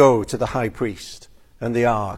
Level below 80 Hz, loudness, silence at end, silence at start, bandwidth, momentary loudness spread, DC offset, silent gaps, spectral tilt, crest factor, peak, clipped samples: -44 dBFS; -22 LUFS; 0 s; 0 s; 15 kHz; 17 LU; under 0.1%; none; -6 dB/octave; 18 dB; -2 dBFS; under 0.1%